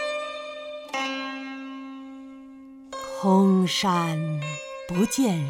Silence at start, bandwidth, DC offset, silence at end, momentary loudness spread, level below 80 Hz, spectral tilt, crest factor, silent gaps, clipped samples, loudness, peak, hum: 0 s; 17 kHz; under 0.1%; 0 s; 21 LU; -62 dBFS; -5 dB/octave; 18 dB; none; under 0.1%; -25 LUFS; -8 dBFS; none